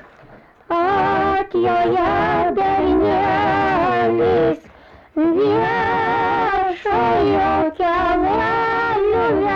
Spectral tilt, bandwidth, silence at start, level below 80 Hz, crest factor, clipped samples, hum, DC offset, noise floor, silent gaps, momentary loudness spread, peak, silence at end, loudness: -7.5 dB/octave; 7.2 kHz; 0.3 s; -40 dBFS; 8 dB; under 0.1%; none; under 0.1%; -45 dBFS; none; 3 LU; -10 dBFS; 0 s; -17 LUFS